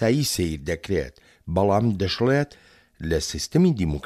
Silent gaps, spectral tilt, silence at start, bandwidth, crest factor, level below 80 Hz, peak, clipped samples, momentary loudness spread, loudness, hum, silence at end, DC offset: none; -5.5 dB/octave; 0 s; 15 kHz; 16 dB; -40 dBFS; -8 dBFS; under 0.1%; 11 LU; -23 LUFS; none; 0.05 s; under 0.1%